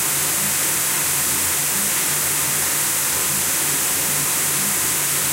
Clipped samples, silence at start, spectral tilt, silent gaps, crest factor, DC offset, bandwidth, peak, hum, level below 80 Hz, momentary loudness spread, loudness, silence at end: under 0.1%; 0 s; -0.5 dB/octave; none; 14 dB; under 0.1%; 16 kHz; -6 dBFS; none; -52 dBFS; 0 LU; -17 LUFS; 0 s